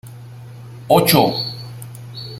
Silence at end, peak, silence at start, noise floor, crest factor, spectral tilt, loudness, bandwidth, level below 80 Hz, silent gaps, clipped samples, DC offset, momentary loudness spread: 0 s; 0 dBFS; 0.05 s; -36 dBFS; 18 dB; -4.5 dB/octave; -15 LUFS; 16.5 kHz; -52 dBFS; none; under 0.1%; under 0.1%; 24 LU